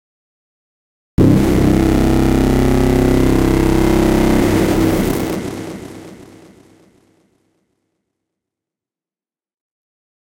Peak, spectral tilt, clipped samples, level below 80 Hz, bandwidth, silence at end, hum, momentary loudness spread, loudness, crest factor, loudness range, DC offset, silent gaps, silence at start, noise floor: 0 dBFS; -7 dB/octave; under 0.1%; -24 dBFS; 17 kHz; 4 s; none; 13 LU; -14 LUFS; 16 dB; 12 LU; under 0.1%; none; 1.2 s; under -90 dBFS